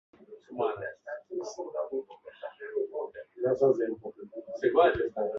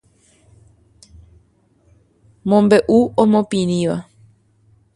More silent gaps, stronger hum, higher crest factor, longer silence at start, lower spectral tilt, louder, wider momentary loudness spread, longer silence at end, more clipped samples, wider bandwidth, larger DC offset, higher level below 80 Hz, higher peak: neither; neither; about the same, 22 dB vs 20 dB; second, 0.2 s vs 2.45 s; about the same, -6 dB/octave vs -7 dB/octave; second, -30 LUFS vs -16 LUFS; first, 19 LU vs 11 LU; second, 0 s vs 0.95 s; neither; second, 7.4 kHz vs 11.5 kHz; neither; second, -62 dBFS vs -52 dBFS; second, -8 dBFS vs 0 dBFS